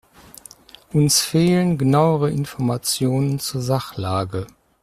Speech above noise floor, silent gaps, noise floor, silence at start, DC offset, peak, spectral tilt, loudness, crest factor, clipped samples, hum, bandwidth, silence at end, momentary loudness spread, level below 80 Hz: 26 dB; none; -45 dBFS; 0.95 s; under 0.1%; -2 dBFS; -5 dB/octave; -19 LUFS; 18 dB; under 0.1%; none; 15.5 kHz; 0.35 s; 8 LU; -52 dBFS